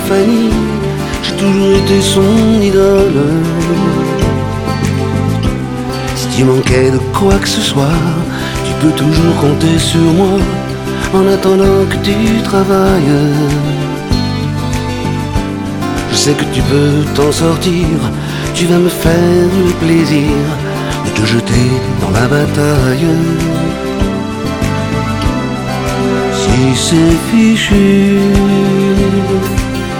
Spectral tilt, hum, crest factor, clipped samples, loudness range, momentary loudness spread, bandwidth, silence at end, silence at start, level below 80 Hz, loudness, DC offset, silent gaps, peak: -6 dB/octave; none; 10 dB; under 0.1%; 4 LU; 7 LU; 18 kHz; 0 s; 0 s; -26 dBFS; -11 LUFS; under 0.1%; none; 0 dBFS